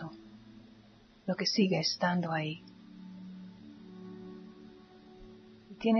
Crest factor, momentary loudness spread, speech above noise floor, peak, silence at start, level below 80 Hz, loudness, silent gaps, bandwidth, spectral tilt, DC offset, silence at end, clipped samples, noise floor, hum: 20 dB; 26 LU; 28 dB; -16 dBFS; 0 s; -70 dBFS; -32 LUFS; none; 6.4 kHz; -4 dB/octave; under 0.1%; 0 s; under 0.1%; -59 dBFS; none